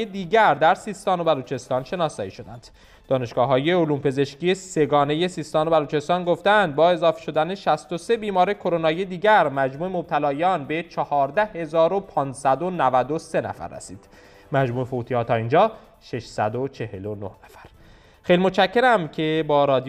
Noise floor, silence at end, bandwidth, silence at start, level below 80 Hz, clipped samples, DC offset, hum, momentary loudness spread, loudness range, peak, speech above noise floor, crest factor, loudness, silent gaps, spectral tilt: -50 dBFS; 0 s; 12 kHz; 0 s; -56 dBFS; under 0.1%; under 0.1%; none; 13 LU; 4 LU; -6 dBFS; 29 dB; 16 dB; -22 LUFS; none; -6 dB/octave